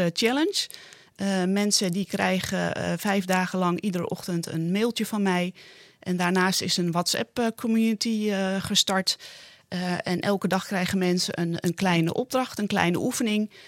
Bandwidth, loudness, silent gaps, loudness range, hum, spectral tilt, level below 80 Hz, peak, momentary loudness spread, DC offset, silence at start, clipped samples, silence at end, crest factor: 16.5 kHz; -25 LUFS; none; 2 LU; none; -4 dB/octave; -64 dBFS; -6 dBFS; 7 LU; under 0.1%; 0 s; under 0.1%; 0 s; 20 dB